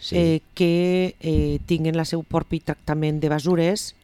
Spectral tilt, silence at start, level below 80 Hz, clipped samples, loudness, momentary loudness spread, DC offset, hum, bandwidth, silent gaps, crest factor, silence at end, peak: -6.5 dB/octave; 0 s; -36 dBFS; under 0.1%; -22 LUFS; 5 LU; under 0.1%; none; 13.5 kHz; none; 16 dB; 0.15 s; -6 dBFS